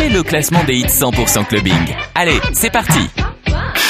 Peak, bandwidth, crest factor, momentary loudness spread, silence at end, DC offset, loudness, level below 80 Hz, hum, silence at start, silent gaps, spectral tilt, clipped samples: 0 dBFS; 16 kHz; 14 dB; 6 LU; 0 s; under 0.1%; -14 LUFS; -26 dBFS; none; 0 s; none; -3.5 dB/octave; under 0.1%